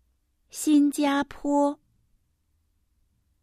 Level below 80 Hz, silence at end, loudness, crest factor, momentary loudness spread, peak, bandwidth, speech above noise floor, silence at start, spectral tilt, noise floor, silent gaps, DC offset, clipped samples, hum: -60 dBFS; 1.7 s; -24 LUFS; 16 dB; 15 LU; -12 dBFS; 15 kHz; 48 dB; 0.55 s; -3 dB/octave; -71 dBFS; none; under 0.1%; under 0.1%; none